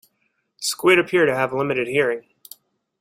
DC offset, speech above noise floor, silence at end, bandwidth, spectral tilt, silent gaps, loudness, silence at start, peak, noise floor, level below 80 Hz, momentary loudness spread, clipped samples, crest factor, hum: under 0.1%; 52 dB; 0.8 s; 16.5 kHz; -4 dB/octave; none; -20 LUFS; 0.6 s; -2 dBFS; -71 dBFS; -64 dBFS; 10 LU; under 0.1%; 20 dB; none